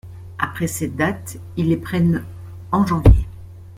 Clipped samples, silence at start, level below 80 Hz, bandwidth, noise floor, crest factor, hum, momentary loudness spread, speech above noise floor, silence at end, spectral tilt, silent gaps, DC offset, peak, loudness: under 0.1%; 0.05 s; -26 dBFS; 16 kHz; -37 dBFS; 18 dB; none; 20 LU; 20 dB; 0 s; -7 dB/octave; none; under 0.1%; -2 dBFS; -20 LUFS